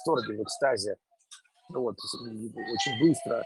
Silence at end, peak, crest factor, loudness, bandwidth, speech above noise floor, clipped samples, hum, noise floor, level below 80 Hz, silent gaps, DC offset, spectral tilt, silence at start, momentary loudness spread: 0 s; -12 dBFS; 18 dB; -30 LUFS; 12.5 kHz; 27 dB; under 0.1%; none; -56 dBFS; -74 dBFS; none; under 0.1%; -4.5 dB/octave; 0 s; 13 LU